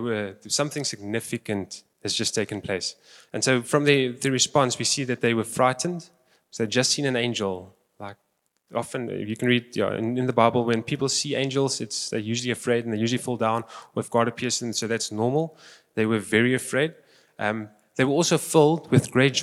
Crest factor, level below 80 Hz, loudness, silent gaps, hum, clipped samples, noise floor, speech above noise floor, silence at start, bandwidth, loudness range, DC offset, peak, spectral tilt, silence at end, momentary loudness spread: 22 dB; -70 dBFS; -24 LUFS; none; none; under 0.1%; -73 dBFS; 49 dB; 0 s; 15 kHz; 5 LU; under 0.1%; -4 dBFS; -4 dB/octave; 0 s; 11 LU